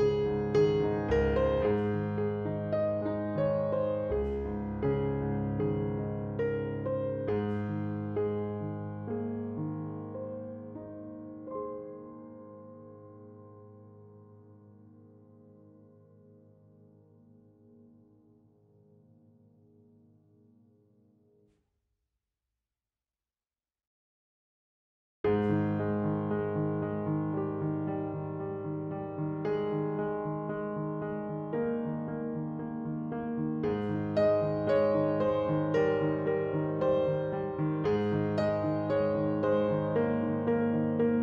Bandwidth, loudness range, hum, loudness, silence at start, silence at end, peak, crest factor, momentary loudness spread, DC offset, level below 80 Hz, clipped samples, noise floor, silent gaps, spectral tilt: 7 kHz; 13 LU; none; -31 LUFS; 0 s; 0 s; -16 dBFS; 16 dB; 12 LU; under 0.1%; -52 dBFS; under 0.1%; under -90 dBFS; 23.87-25.24 s; -9.5 dB/octave